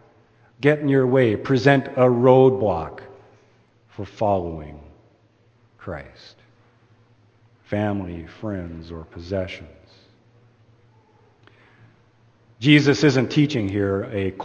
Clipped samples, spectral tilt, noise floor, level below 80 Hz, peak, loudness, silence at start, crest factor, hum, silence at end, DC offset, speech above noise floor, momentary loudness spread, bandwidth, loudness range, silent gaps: under 0.1%; -7 dB/octave; -58 dBFS; -52 dBFS; 0 dBFS; -20 LUFS; 0.6 s; 22 dB; none; 0 s; under 0.1%; 38 dB; 21 LU; 8.6 kHz; 18 LU; none